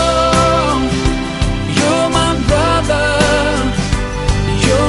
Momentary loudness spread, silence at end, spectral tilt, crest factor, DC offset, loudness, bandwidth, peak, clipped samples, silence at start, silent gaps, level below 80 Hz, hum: 6 LU; 0 s; -5 dB/octave; 14 dB; under 0.1%; -14 LUFS; 11.5 kHz; 0 dBFS; under 0.1%; 0 s; none; -22 dBFS; none